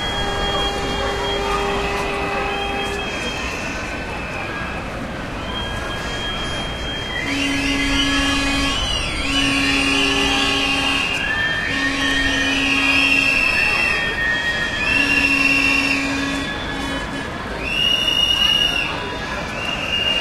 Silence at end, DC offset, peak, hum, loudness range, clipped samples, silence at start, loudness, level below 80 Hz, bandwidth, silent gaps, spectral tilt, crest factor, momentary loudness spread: 0 s; under 0.1%; -4 dBFS; none; 9 LU; under 0.1%; 0 s; -18 LUFS; -32 dBFS; 15 kHz; none; -3 dB/octave; 16 dB; 11 LU